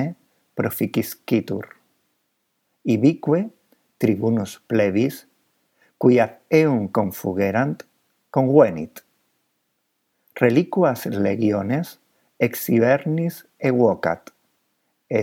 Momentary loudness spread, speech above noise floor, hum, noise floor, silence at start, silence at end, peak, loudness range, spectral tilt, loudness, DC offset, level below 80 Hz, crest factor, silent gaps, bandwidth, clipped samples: 13 LU; 53 dB; none; -73 dBFS; 0 s; 0 s; 0 dBFS; 3 LU; -7 dB/octave; -21 LUFS; under 0.1%; -66 dBFS; 22 dB; none; 18 kHz; under 0.1%